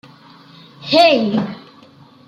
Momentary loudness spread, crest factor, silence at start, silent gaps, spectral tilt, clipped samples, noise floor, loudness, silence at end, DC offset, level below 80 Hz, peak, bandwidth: 22 LU; 18 dB; 0.8 s; none; -5.5 dB/octave; under 0.1%; -45 dBFS; -14 LUFS; 0.7 s; under 0.1%; -64 dBFS; 0 dBFS; 12 kHz